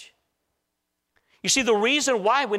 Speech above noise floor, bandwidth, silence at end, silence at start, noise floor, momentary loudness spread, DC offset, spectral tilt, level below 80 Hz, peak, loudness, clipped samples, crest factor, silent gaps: 58 dB; 15.5 kHz; 0 s; 0 s; -79 dBFS; 3 LU; under 0.1%; -1.5 dB/octave; -64 dBFS; -8 dBFS; -21 LUFS; under 0.1%; 16 dB; none